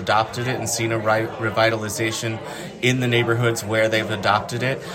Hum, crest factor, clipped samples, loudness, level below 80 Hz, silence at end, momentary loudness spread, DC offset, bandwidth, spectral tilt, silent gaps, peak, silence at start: none; 18 dB; under 0.1%; -21 LUFS; -56 dBFS; 0 s; 5 LU; under 0.1%; 16.5 kHz; -4.5 dB/octave; none; -4 dBFS; 0 s